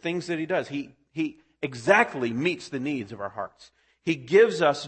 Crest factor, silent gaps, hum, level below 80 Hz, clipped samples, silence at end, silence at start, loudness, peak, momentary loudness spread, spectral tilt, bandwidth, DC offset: 22 dB; none; none; -68 dBFS; under 0.1%; 0 s; 0 s; -26 LUFS; -4 dBFS; 15 LU; -5.5 dB/octave; 8.8 kHz; under 0.1%